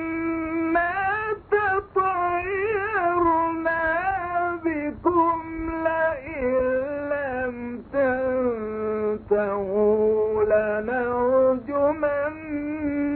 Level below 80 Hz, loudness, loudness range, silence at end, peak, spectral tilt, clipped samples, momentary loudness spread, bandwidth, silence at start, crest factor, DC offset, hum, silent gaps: -48 dBFS; -24 LUFS; 3 LU; 0 s; -8 dBFS; -10.5 dB/octave; under 0.1%; 7 LU; 4.5 kHz; 0 s; 14 dB; under 0.1%; none; none